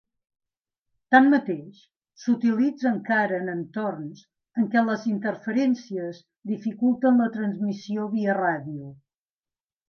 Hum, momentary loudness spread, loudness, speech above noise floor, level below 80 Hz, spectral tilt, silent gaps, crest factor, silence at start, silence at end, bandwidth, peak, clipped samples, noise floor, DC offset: none; 14 LU; -24 LUFS; over 66 dB; -78 dBFS; -7 dB/octave; none; 22 dB; 1.1 s; 0.95 s; 6.6 kHz; -2 dBFS; under 0.1%; under -90 dBFS; under 0.1%